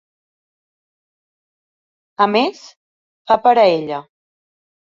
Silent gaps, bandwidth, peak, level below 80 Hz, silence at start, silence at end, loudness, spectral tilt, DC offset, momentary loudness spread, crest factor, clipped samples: 2.76-3.25 s; 7.4 kHz; -2 dBFS; -66 dBFS; 2.2 s; 0.85 s; -15 LUFS; -5.5 dB/octave; under 0.1%; 13 LU; 18 dB; under 0.1%